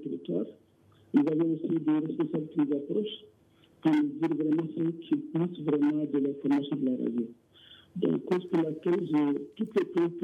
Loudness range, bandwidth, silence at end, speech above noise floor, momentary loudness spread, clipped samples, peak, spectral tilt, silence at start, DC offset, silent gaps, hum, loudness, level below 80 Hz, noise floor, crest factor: 1 LU; 5.4 kHz; 0 s; 33 dB; 7 LU; under 0.1%; -12 dBFS; -9 dB/octave; 0 s; under 0.1%; none; none; -30 LUFS; -80 dBFS; -61 dBFS; 16 dB